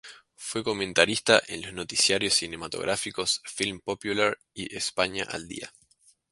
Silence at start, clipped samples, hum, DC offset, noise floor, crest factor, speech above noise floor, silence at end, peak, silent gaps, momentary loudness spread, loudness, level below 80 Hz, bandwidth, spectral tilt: 0.05 s; under 0.1%; none; under 0.1%; -63 dBFS; 26 dB; 35 dB; 0.6 s; -2 dBFS; none; 14 LU; -26 LUFS; -60 dBFS; 11.5 kHz; -2 dB/octave